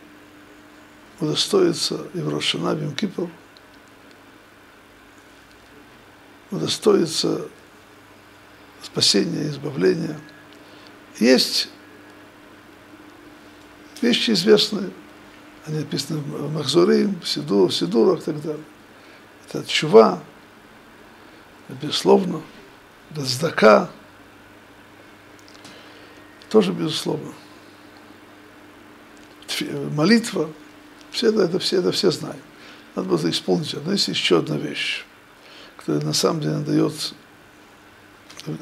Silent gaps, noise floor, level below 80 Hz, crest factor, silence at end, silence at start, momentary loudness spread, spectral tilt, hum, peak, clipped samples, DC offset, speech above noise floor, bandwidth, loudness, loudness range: none; -48 dBFS; -64 dBFS; 22 dB; 0.05 s; 1.2 s; 21 LU; -4.5 dB/octave; none; 0 dBFS; under 0.1%; under 0.1%; 28 dB; 15.5 kHz; -20 LUFS; 6 LU